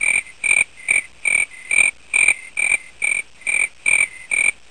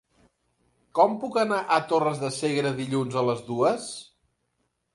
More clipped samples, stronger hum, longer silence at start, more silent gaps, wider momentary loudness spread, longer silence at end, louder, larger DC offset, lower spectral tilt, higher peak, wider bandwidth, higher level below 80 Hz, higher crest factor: neither; neither; second, 0 s vs 0.95 s; neither; second, 4 LU vs 8 LU; second, 0.2 s vs 0.9 s; first, -17 LUFS vs -25 LUFS; first, 0.5% vs under 0.1%; second, 1.5 dB/octave vs -5 dB/octave; first, -2 dBFS vs -6 dBFS; about the same, 11 kHz vs 11.5 kHz; first, -54 dBFS vs -70 dBFS; about the same, 18 dB vs 20 dB